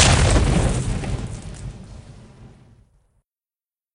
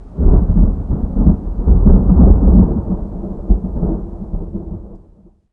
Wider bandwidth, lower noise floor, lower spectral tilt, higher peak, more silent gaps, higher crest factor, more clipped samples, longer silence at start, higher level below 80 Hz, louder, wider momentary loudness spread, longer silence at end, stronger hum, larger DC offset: first, 11 kHz vs 1.6 kHz; first, under -90 dBFS vs -46 dBFS; second, -4 dB/octave vs -14.5 dB/octave; about the same, 0 dBFS vs 0 dBFS; neither; first, 22 dB vs 12 dB; neither; about the same, 0 s vs 0 s; second, -28 dBFS vs -14 dBFS; second, -20 LUFS vs -14 LUFS; first, 24 LU vs 17 LU; first, 1.5 s vs 0.55 s; neither; neither